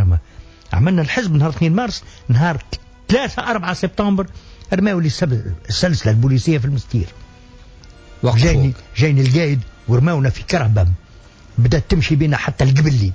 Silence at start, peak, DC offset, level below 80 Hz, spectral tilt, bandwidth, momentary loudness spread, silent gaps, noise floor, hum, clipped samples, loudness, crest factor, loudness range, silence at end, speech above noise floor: 0 s; -4 dBFS; under 0.1%; -30 dBFS; -6.5 dB/octave; 8 kHz; 8 LU; none; -42 dBFS; none; under 0.1%; -17 LUFS; 14 dB; 3 LU; 0 s; 26 dB